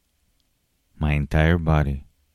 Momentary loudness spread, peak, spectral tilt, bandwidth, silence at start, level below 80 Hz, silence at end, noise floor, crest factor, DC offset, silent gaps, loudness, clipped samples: 9 LU; -6 dBFS; -8 dB/octave; 11 kHz; 1 s; -30 dBFS; 0.3 s; -69 dBFS; 18 dB; under 0.1%; none; -22 LUFS; under 0.1%